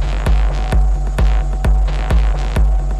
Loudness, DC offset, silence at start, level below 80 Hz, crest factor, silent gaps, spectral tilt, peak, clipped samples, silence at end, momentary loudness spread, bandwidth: -17 LUFS; under 0.1%; 0 s; -14 dBFS; 10 dB; none; -6.5 dB/octave; -4 dBFS; under 0.1%; 0 s; 1 LU; 9.4 kHz